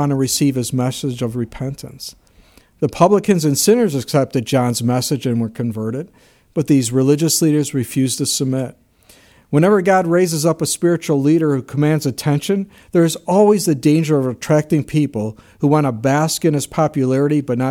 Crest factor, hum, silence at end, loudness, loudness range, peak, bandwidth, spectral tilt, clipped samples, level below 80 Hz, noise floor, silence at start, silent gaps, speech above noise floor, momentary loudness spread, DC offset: 16 dB; none; 0 s; -17 LUFS; 2 LU; 0 dBFS; 17 kHz; -5.5 dB/octave; under 0.1%; -52 dBFS; -50 dBFS; 0 s; none; 34 dB; 10 LU; under 0.1%